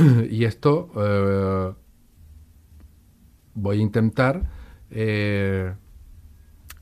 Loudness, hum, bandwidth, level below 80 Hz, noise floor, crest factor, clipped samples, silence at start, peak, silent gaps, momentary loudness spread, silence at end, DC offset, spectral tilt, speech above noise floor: -23 LUFS; none; 14 kHz; -42 dBFS; -53 dBFS; 18 dB; under 0.1%; 0 s; -4 dBFS; none; 12 LU; 0.1 s; under 0.1%; -8.5 dB/octave; 33 dB